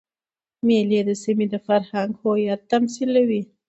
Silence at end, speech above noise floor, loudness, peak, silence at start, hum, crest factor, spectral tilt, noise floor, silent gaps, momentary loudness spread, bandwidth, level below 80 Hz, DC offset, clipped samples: 0.25 s; over 70 dB; -21 LUFS; -6 dBFS; 0.65 s; none; 16 dB; -6 dB/octave; under -90 dBFS; none; 4 LU; 8.2 kHz; -68 dBFS; under 0.1%; under 0.1%